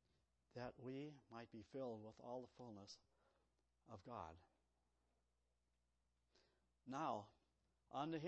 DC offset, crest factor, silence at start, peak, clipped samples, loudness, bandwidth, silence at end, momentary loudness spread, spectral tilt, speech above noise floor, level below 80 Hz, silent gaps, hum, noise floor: under 0.1%; 22 dB; 0.55 s; -34 dBFS; under 0.1%; -54 LUFS; 8 kHz; 0 s; 14 LU; -5.5 dB/octave; 35 dB; -84 dBFS; none; none; -88 dBFS